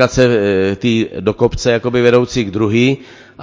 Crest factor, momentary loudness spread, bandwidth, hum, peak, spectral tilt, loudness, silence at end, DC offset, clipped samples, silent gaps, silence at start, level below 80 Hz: 14 dB; 5 LU; 8 kHz; none; 0 dBFS; -6 dB/octave; -14 LUFS; 0 s; under 0.1%; 0.2%; none; 0 s; -36 dBFS